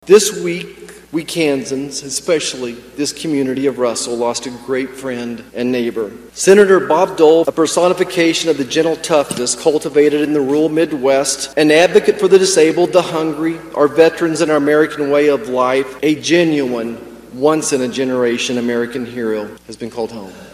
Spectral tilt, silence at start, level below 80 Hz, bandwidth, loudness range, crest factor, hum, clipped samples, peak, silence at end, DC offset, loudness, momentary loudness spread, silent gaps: -4 dB/octave; 0.05 s; -54 dBFS; 15 kHz; 6 LU; 14 dB; none; 0.1%; 0 dBFS; 0.05 s; under 0.1%; -15 LUFS; 13 LU; none